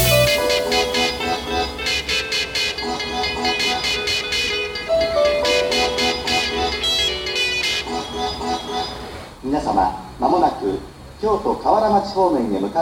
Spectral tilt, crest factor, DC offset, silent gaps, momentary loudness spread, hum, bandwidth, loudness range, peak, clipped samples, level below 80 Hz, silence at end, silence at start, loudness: -3 dB/octave; 16 dB; under 0.1%; none; 8 LU; none; over 20 kHz; 3 LU; -4 dBFS; under 0.1%; -38 dBFS; 0 s; 0 s; -19 LUFS